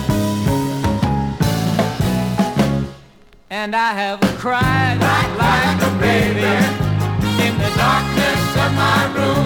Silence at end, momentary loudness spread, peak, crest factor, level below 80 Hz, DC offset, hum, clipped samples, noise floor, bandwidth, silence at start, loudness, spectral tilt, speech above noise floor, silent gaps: 0 s; 4 LU; -2 dBFS; 16 dB; -34 dBFS; under 0.1%; none; under 0.1%; -46 dBFS; over 20 kHz; 0 s; -17 LUFS; -5.5 dB/octave; 30 dB; none